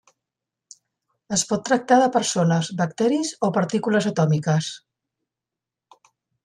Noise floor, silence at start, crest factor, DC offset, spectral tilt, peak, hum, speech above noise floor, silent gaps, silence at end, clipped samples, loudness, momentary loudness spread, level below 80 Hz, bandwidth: -87 dBFS; 1.3 s; 18 dB; under 0.1%; -5 dB/octave; -4 dBFS; none; 66 dB; none; 1.65 s; under 0.1%; -21 LUFS; 7 LU; -66 dBFS; 12 kHz